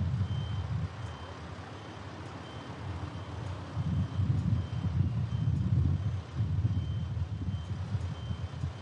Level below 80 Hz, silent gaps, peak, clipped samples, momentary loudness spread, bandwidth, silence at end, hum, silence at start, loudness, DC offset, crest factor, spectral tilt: -48 dBFS; none; -16 dBFS; under 0.1%; 13 LU; 8.6 kHz; 0 s; none; 0 s; -34 LUFS; under 0.1%; 16 dB; -8 dB/octave